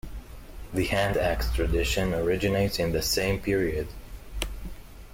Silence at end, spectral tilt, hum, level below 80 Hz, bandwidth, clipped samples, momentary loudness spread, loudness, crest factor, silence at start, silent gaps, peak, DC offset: 0 s; -4.5 dB/octave; none; -36 dBFS; 16.5 kHz; under 0.1%; 19 LU; -27 LUFS; 16 dB; 0.05 s; none; -10 dBFS; under 0.1%